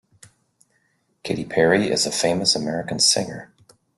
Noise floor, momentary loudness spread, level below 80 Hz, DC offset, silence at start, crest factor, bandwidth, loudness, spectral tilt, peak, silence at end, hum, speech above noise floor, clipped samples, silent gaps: -67 dBFS; 14 LU; -60 dBFS; under 0.1%; 1.25 s; 20 dB; 12.5 kHz; -20 LUFS; -2.5 dB/octave; -2 dBFS; 0.5 s; none; 46 dB; under 0.1%; none